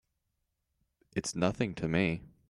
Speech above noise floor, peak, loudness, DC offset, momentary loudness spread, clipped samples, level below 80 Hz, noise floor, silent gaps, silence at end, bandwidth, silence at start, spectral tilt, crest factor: 50 dB; -14 dBFS; -33 LUFS; under 0.1%; 7 LU; under 0.1%; -60 dBFS; -82 dBFS; none; 0.2 s; 12 kHz; 1.15 s; -5.5 dB/octave; 20 dB